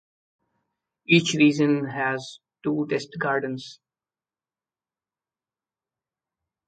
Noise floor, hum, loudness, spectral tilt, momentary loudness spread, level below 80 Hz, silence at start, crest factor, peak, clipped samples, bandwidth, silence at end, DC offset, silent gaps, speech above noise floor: under -90 dBFS; none; -23 LUFS; -5 dB/octave; 18 LU; -70 dBFS; 1.1 s; 24 dB; -4 dBFS; under 0.1%; 9.2 kHz; 2.95 s; under 0.1%; none; over 67 dB